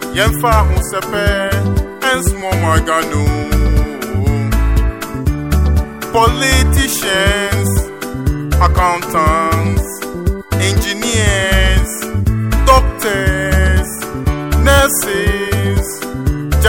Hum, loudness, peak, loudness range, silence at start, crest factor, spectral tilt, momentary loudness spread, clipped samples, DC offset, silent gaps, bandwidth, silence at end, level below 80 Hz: none; -14 LUFS; 0 dBFS; 2 LU; 0 s; 14 dB; -4.5 dB/octave; 8 LU; under 0.1%; under 0.1%; none; 17 kHz; 0 s; -18 dBFS